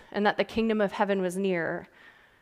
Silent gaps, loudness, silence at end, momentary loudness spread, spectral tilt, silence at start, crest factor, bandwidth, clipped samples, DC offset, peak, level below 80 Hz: none; -28 LUFS; 0.3 s; 5 LU; -6 dB/octave; 0.15 s; 18 dB; 14.5 kHz; under 0.1%; under 0.1%; -10 dBFS; -60 dBFS